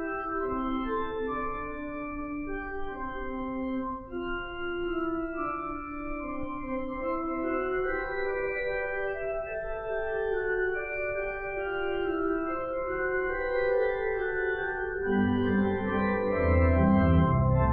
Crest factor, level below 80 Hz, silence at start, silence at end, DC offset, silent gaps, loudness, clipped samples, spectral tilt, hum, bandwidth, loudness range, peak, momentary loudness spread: 18 dB; -40 dBFS; 0 s; 0 s; under 0.1%; none; -30 LUFS; under 0.1%; -11 dB/octave; none; 4.4 kHz; 7 LU; -12 dBFS; 11 LU